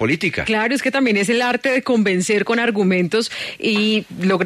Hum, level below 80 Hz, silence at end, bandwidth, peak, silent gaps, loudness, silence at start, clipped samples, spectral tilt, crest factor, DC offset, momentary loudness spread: none; -54 dBFS; 0 s; 13.5 kHz; -6 dBFS; none; -18 LUFS; 0 s; under 0.1%; -4.5 dB/octave; 12 dB; under 0.1%; 3 LU